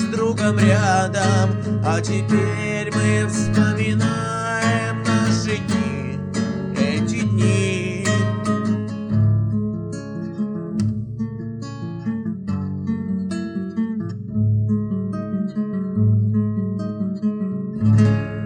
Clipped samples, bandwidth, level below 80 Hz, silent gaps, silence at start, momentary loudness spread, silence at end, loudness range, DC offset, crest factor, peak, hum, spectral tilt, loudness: under 0.1%; 10 kHz; -48 dBFS; none; 0 s; 9 LU; 0 s; 7 LU; under 0.1%; 16 dB; -4 dBFS; none; -6.5 dB/octave; -21 LUFS